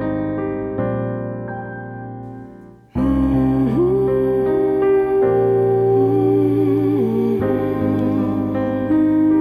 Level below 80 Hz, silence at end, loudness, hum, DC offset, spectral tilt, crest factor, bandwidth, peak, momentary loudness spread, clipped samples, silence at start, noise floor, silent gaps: -38 dBFS; 0 s; -18 LUFS; none; under 0.1%; -10.5 dB/octave; 12 dB; 11.5 kHz; -6 dBFS; 13 LU; under 0.1%; 0 s; -40 dBFS; none